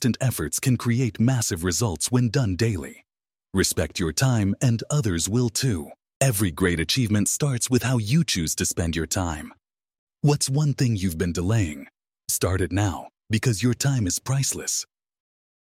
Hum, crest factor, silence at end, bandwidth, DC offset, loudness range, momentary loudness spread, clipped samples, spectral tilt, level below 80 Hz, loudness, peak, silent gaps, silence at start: none; 18 dB; 0.9 s; 16.5 kHz; under 0.1%; 2 LU; 6 LU; under 0.1%; -4.5 dB/octave; -44 dBFS; -23 LUFS; -6 dBFS; 6.16-6.20 s, 9.99-10.07 s; 0 s